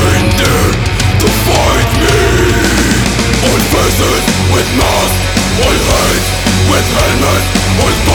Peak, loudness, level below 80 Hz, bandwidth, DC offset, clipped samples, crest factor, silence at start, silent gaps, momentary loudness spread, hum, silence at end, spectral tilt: 0 dBFS; -10 LUFS; -18 dBFS; over 20 kHz; 0.1%; under 0.1%; 10 dB; 0 s; none; 2 LU; none; 0 s; -4 dB/octave